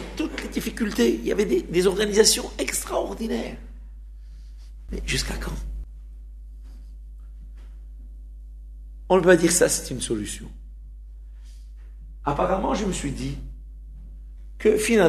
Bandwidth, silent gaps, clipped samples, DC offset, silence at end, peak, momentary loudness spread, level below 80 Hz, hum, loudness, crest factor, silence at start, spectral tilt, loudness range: 13.5 kHz; none; under 0.1%; under 0.1%; 0 s; -2 dBFS; 26 LU; -38 dBFS; none; -23 LUFS; 22 dB; 0 s; -3.5 dB/octave; 11 LU